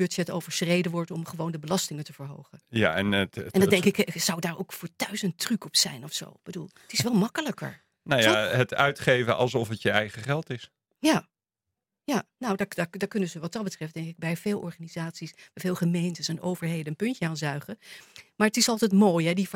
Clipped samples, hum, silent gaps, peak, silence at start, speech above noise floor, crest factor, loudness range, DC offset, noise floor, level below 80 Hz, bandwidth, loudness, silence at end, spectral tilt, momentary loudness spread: under 0.1%; none; none; -4 dBFS; 0 s; 60 dB; 24 dB; 6 LU; under 0.1%; -87 dBFS; -68 dBFS; 16.5 kHz; -27 LUFS; 0 s; -4.5 dB/octave; 16 LU